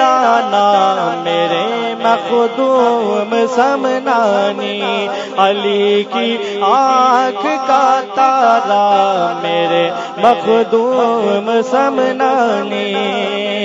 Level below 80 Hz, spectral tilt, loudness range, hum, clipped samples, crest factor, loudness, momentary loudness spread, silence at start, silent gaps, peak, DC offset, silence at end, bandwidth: -66 dBFS; -4.5 dB/octave; 2 LU; none; under 0.1%; 12 dB; -13 LUFS; 6 LU; 0 s; none; 0 dBFS; under 0.1%; 0 s; 7.8 kHz